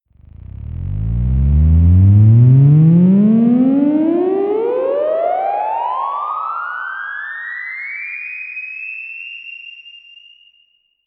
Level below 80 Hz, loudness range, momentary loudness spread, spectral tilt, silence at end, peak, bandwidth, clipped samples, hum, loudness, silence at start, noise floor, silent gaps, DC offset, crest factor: -26 dBFS; 15 LU; 18 LU; -13 dB/octave; 1.1 s; -2 dBFS; 3.9 kHz; under 0.1%; none; -14 LUFS; 0.6 s; -58 dBFS; none; under 0.1%; 14 dB